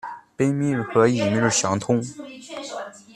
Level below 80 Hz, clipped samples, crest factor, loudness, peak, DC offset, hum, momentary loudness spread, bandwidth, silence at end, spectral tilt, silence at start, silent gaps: -60 dBFS; under 0.1%; 20 dB; -21 LUFS; -4 dBFS; under 0.1%; none; 16 LU; 12.5 kHz; 0.05 s; -5 dB/octave; 0.05 s; none